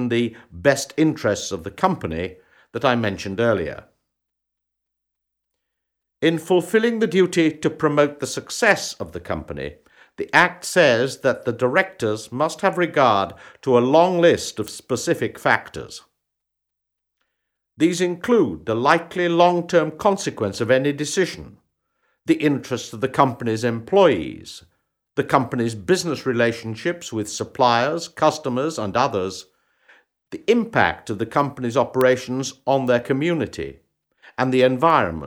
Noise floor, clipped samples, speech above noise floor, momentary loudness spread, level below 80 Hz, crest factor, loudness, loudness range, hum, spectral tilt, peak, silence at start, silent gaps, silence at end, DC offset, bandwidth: -81 dBFS; under 0.1%; 61 dB; 13 LU; -54 dBFS; 20 dB; -20 LUFS; 6 LU; none; -5 dB/octave; -2 dBFS; 0 s; none; 0 s; under 0.1%; over 20 kHz